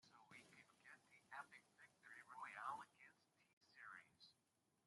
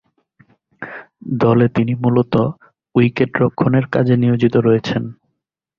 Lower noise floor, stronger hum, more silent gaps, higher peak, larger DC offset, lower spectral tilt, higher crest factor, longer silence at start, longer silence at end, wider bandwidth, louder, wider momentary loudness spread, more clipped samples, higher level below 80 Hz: first, -86 dBFS vs -74 dBFS; neither; first, 3.53-3.61 s vs none; second, -38 dBFS vs -2 dBFS; neither; second, -2.5 dB/octave vs -9 dB/octave; first, 24 dB vs 16 dB; second, 0.05 s vs 0.8 s; second, 0.5 s vs 0.65 s; first, 11.5 kHz vs 6.8 kHz; second, -59 LUFS vs -16 LUFS; second, 15 LU vs 18 LU; neither; second, under -90 dBFS vs -50 dBFS